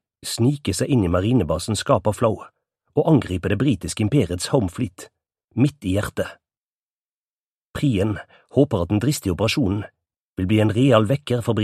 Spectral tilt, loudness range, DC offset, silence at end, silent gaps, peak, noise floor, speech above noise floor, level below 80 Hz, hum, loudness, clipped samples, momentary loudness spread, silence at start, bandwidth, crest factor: -6 dB/octave; 5 LU; under 0.1%; 0 s; 5.44-5.48 s, 6.57-7.74 s, 10.21-10.36 s; 0 dBFS; under -90 dBFS; over 70 dB; -46 dBFS; none; -21 LUFS; under 0.1%; 11 LU; 0.25 s; 14.5 kHz; 22 dB